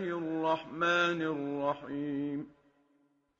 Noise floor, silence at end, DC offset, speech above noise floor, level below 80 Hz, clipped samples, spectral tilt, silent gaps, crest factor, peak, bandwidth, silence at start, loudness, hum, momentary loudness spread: -72 dBFS; 0.9 s; under 0.1%; 39 dB; -74 dBFS; under 0.1%; -3.5 dB/octave; none; 16 dB; -18 dBFS; 7.4 kHz; 0 s; -33 LUFS; none; 10 LU